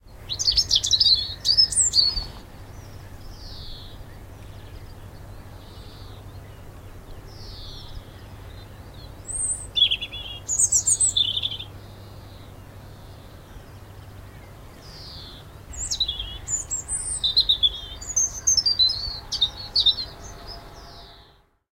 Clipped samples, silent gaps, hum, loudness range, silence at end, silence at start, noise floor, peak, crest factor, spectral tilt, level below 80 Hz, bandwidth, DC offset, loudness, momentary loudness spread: under 0.1%; none; none; 22 LU; 0.5 s; 0.05 s; -55 dBFS; -6 dBFS; 22 dB; 0 dB/octave; -42 dBFS; 16 kHz; under 0.1%; -20 LUFS; 26 LU